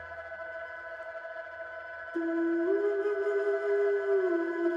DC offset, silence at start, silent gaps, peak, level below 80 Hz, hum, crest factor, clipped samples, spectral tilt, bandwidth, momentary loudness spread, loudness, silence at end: under 0.1%; 0 s; none; -18 dBFS; -72 dBFS; none; 12 dB; under 0.1%; -6 dB/octave; 7.2 kHz; 13 LU; -31 LUFS; 0 s